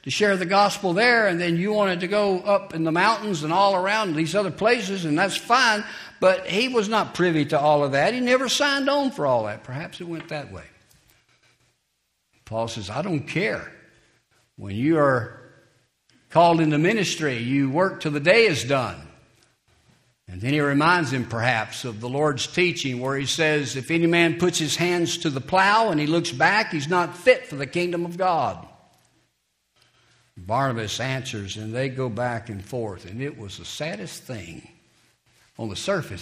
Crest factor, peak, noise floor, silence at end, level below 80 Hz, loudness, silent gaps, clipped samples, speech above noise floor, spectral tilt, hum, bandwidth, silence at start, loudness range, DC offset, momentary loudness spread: 22 dB; -2 dBFS; -73 dBFS; 0 s; -60 dBFS; -22 LUFS; none; under 0.1%; 51 dB; -4.5 dB/octave; none; 15.5 kHz; 0.05 s; 10 LU; under 0.1%; 14 LU